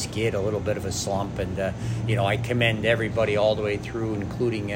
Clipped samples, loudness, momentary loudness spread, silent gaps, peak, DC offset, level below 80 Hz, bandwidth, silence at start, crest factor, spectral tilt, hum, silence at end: under 0.1%; -25 LUFS; 7 LU; none; -8 dBFS; under 0.1%; -46 dBFS; 16 kHz; 0 s; 16 dB; -5.5 dB/octave; none; 0 s